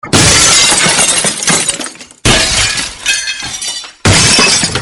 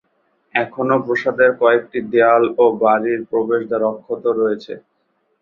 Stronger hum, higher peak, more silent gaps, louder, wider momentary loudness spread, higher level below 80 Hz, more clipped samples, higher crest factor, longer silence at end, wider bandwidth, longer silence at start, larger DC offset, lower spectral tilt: neither; about the same, 0 dBFS vs -2 dBFS; neither; first, -8 LUFS vs -17 LUFS; first, 12 LU vs 8 LU; first, -30 dBFS vs -62 dBFS; first, 0.3% vs under 0.1%; second, 10 dB vs 16 dB; second, 0 s vs 0.6 s; first, over 20 kHz vs 6.2 kHz; second, 0.05 s vs 0.55 s; neither; second, -1.5 dB/octave vs -7.5 dB/octave